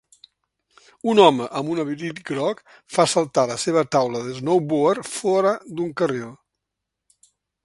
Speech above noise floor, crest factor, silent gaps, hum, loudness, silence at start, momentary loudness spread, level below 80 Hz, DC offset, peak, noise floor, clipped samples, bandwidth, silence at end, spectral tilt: 62 dB; 22 dB; none; none; -21 LUFS; 1.05 s; 12 LU; -66 dBFS; under 0.1%; 0 dBFS; -82 dBFS; under 0.1%; 11.5 kHz; 1.3 s; -4.5 dB/octave